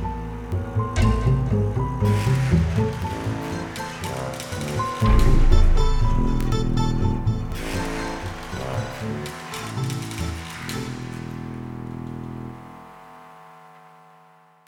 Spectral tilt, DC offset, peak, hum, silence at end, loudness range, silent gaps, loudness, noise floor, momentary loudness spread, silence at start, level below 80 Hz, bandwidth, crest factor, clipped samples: -6.5 dB/octave; under 0.1%; -2 dBFS; none; 1 s; 11 LU; none; -25 LUFS; -53 dBFS; 14 LU; 0 s; -26 dBFS; 15 kHz; 20 dB; under 0.1%